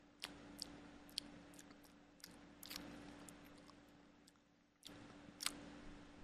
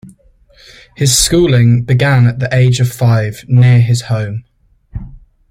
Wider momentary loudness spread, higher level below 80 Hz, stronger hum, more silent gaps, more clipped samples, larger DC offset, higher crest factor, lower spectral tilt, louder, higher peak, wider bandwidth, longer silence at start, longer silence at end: about the same, 19 LU vs 18 LU; second, -72 dBFS vs -34 dBFS; neither; neither; neither; neither; first, 40 dB vs 12 dB; second, -2 dB/octave vs -5 dB/octave; second, -54 LUFS vs -11 LUFS; second, -16 dBFS vs 0 dBFS; second, 14.5 kHz vs 16 kHz; about the same, 0 s vs 0.05 s; second, 0 s vs 0.35 s